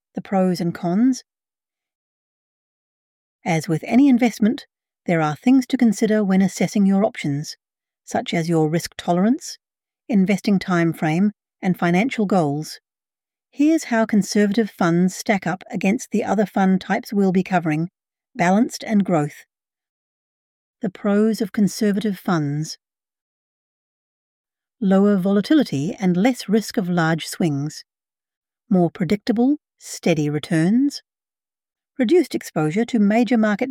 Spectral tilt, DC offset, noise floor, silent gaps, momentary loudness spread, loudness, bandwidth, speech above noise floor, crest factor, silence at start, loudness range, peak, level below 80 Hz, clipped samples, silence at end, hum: -6.5 dB/octave; under 0.1%; under -90 dBFS; 1.95-3.39 s, 19.89-20.74 s, 23.21-24.44 s, 28.37-28.42 s; 9 LU; -20 LUFS; 16 kHz; over 71 dB; 16 dB; 0.15 s; 4 LU; -4 dBFS; -64 dBFS; under 0.1%; 0 s; none